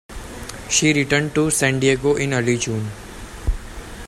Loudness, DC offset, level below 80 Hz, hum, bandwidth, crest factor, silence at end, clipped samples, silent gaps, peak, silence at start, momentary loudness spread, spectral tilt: -19 LUFS; under 0.1%; -32 dBFS; none; 15.5 kHz; 18 dB; 0 s; under 0.1%; none; -4 dBFS; 0.1 s; 18 LU; -4 dB/octave